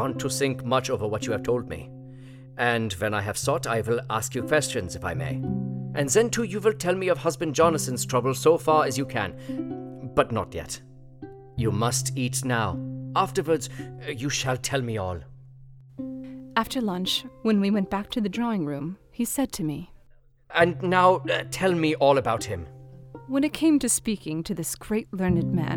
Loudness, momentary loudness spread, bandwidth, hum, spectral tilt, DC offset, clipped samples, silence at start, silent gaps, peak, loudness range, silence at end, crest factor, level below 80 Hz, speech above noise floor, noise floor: -25 LUFS; 15 LU; 18.5 kHz; none; -4.5 dB/octave; under 0.1%; under 0.1%; 0 s; none; -6 dBFS; 5 LU; 0 s; 20 dB; -52 dBFS; 30 dB; -55 dBFS